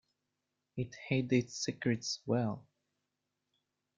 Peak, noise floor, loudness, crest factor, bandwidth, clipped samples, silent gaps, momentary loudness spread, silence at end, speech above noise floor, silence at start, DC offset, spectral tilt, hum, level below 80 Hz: -18 dBFS; -86 dBFS; -35 LUFS; 20 dB; 9 kHz; under 0.1%; none; 11 LU; 1.35 s; 52 dB; 0.75 s; under 0.1%; -5 dB/octave; 50 Hz at -70 dBFS; -72 dBFS